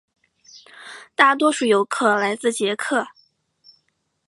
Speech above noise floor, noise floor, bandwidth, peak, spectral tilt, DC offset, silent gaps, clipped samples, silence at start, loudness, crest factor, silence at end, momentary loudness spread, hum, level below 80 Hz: 51 dB; -70 dBFS; 11.5 kHz; 0 dBFS; -3 dB/octave; under 0.1%; none; under 0.1%; 0.55 s; -19 LUFS; 22 dB; 1.2 s; 22 LU; none; -76 dBFS